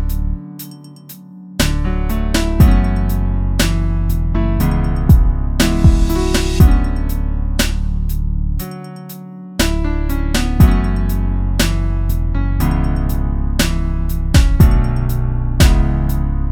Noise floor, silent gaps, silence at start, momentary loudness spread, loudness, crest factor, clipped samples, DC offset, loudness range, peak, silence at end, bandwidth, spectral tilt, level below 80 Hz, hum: -36 dBFS; none; 0 s; 14 LU; -16 LUFS; 14 dB; under 0.1%; under 0.1%; 4 LU; 0 dBFS; 0 s; 18 kHz; -5.5 dB/octave; -16 dBFS; none